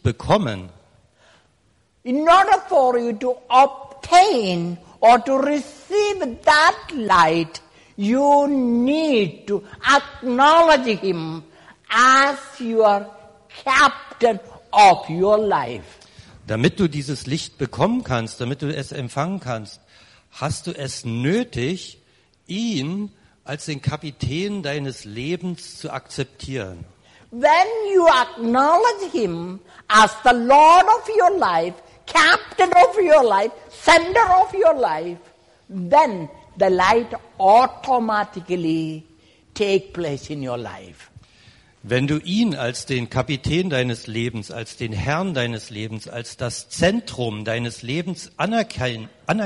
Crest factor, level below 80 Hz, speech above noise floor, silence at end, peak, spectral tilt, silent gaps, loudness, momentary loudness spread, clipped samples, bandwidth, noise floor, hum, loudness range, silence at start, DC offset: 16 dB; -50 dBFS; 43 dB; 0 s; -4 dBFS; -5 dB/octave; none; -18 LUFS; 16 LU; under 0.1%; 11.5 kHz; -61 dBFS; none; 11 LU; 0.05 s; under 0.1%